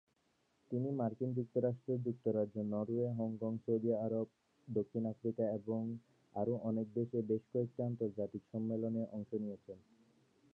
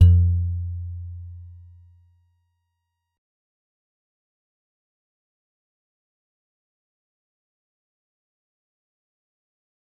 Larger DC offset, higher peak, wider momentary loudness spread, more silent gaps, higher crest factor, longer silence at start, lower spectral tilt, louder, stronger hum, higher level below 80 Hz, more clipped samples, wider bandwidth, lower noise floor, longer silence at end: neither; second, -22 dBFS vs -4 dBFS; second, 6 LU vs 24 LU; neither; second, 16 dB vs 24 dB; first, 0.7 s vs 0 s; about the same, -12 dB/octave vs -11 dB/octave; second, -39 LUFS vs -23 LUFS; neither; second, -78 dBFS vs -44 dBFS; neither; about the same, 3.2 kHz vs 3.1 kHz; about the same, -78 dBFS vs -79 dBFS; second, 0.75 s vs 8.5 s